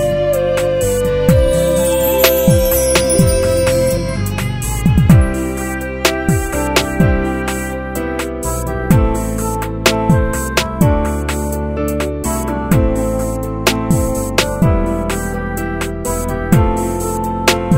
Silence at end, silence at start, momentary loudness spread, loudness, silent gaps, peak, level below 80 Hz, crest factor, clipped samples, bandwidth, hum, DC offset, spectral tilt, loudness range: 0 s; 0 s; 8 LU; -15 LUFS; none; 0 dBFS; -22 dBFS; 14 dB; under 0.1%; 16.5 kHz; none; under 0.1%; -5 dB/octave; 4 LU